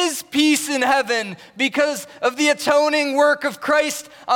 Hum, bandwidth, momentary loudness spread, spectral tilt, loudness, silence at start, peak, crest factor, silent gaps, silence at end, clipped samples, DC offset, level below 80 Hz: none; 18 kHz; 7 LU; -2 dB/octave; -19 LUFS; 0 s; -6 dBFS; 14 dB; none; 0 s; under 0.1%; under 0.1%; -68 dBFS